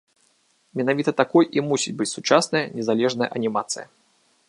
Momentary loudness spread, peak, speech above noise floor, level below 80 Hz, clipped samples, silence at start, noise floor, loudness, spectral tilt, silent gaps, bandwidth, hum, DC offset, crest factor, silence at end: 8 LU; -2 dBFS; 42 dB; -72 dBFS; under 0.1%; 0.75 s; -64 dBFS; -22 LUFS; -4 dB/octave; none; 11.5 kHz; none; under 0.1%; 22 dB; 0.65 s